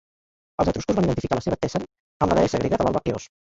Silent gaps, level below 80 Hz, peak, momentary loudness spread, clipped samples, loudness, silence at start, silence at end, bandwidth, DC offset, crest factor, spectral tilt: 2.00-2.20 s; -42 dBFS; -4 dBFS; 9 LU; under 0.1%; -23 LUFS; 0.6 s; 0.2 s; 8 kHz; under 0.1%; 20 dB; -6.5 dB/octave